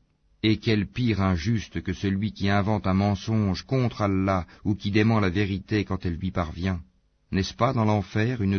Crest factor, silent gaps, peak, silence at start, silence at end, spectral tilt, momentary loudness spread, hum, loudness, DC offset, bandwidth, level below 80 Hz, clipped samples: 16 dB; none; -8 dBFS; 0.45 s; 0 s; -7 dB/octave; 6 LU; none; -26 LUFS; under 0.1%; 6.6 kHz; -46 dBFS; under 0.1%